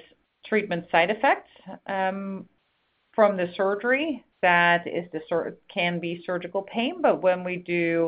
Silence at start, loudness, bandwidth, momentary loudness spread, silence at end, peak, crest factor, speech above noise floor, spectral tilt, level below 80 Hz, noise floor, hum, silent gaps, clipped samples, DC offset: 0.45 s; -25 LUFS; 5.2 kHz; 11 LU; 0 s; -4 dBFS; 22 dB; 47 dB; -9.5 dB/octave; -68 dBFS; -71 dBFS; none; none; under 0.1%; under 0.1%